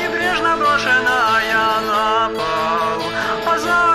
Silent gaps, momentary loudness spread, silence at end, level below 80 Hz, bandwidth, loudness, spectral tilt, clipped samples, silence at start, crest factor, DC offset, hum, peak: none; 5 LU; 0 s; -46 dBFS; 14 kHz; -16 LUFS; -3 dB/octave; under 0.1%; 0 s; 12 dB; under 0.1%; none; -4 dBFS